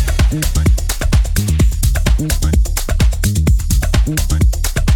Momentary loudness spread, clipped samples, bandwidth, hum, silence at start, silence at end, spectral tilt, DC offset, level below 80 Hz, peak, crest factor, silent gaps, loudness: 2 LU; under 0.1%; 19 kHz; none; 0 s; 0 s; -5 dB/octave; under 0.1%; -14 dBFS; -2 dBFS; 12 dB; none; -16 LUFS